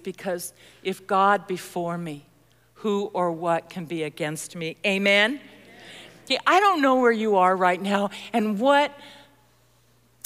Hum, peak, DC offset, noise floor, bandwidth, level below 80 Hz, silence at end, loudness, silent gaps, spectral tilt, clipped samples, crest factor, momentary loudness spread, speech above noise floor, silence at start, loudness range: none; -6 dBFS; under 0.1%; -61 dBFS; 16 kHz; -70 dBFS; 1.1 s; -23 LUFS; none; -4.5 dB/octave; under 0.1%; 18 dB; 15 LU; 38 dB; 0.05 s; 7 LU